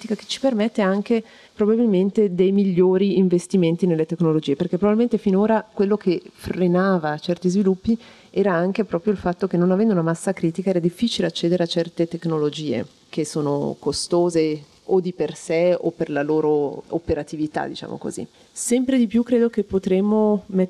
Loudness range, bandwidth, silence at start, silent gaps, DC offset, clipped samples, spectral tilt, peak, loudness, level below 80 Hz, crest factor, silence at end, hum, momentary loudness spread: 4 LU; 12.5 kHz; 0 s; none; under 0.1%; under 0.1%; -6.5 dB/octave; -6 dBFS; -21 LUFS; -54 dBFS; 14 dB; 0 s; none; 8 LU